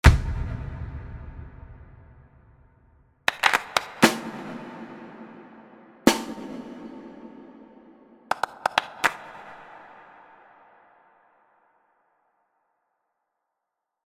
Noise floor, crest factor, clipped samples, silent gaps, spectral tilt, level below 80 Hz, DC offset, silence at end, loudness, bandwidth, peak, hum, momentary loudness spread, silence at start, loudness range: -84 dBFS; 28 dB; under 0.1%; none; -4.5 dB/octave; -36 dBFS; under 0.1%; 4.25 s; -25 LUFS; 16 kHz; 0 dBFS; none; 26 LU; 0.05 s; 6 LU